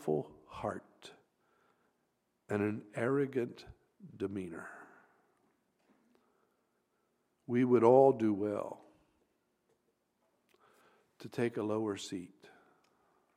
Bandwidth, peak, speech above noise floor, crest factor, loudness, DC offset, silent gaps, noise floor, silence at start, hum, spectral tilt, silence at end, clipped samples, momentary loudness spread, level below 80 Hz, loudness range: 12.5 kHz; -12 dBFS; 47 dB; 24 dB; -33 LUFS; under 0.1%; none; -80 dBFS; 0 s; none; -7 dB/octave; 1.1 s; under 0.1%; 23 LU; -74 dBFS; 16 LU